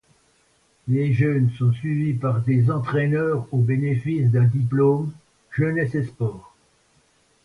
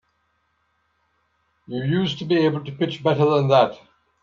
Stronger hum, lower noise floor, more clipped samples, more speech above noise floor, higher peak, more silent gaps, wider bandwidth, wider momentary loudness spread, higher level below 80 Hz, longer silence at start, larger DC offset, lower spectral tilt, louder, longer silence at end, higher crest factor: neither; second, -62 dBFS vs -69 dBFS; neither; second, 42 dB vs 49 dB; second, -8 dBFS vs -2 dBFS; neither; second, 4.5 kHz vs 7.2 kHz; about the same, 7 LU vs 9 LU; first, -56 dBFS vs -64 dBFS; second, 0.85 s vs 1.7 s; neither; first, -10 dB/octave vs -7.5 dB/octave; about the same, -22 LUFS vs -21 LUFS; first, 1.05 s vs 0.5 s; second, 14 dB vs 20 dB